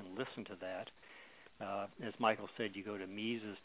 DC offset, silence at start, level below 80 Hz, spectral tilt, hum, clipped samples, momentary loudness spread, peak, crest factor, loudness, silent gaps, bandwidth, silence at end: under 0.1%; 0 s; -78 dBFS; -3 dB/octave; none; under 0.1%; 20 LU; -18 dBFS; 24 dB; -42 LUFS; none; 4 kHz; 0.05 s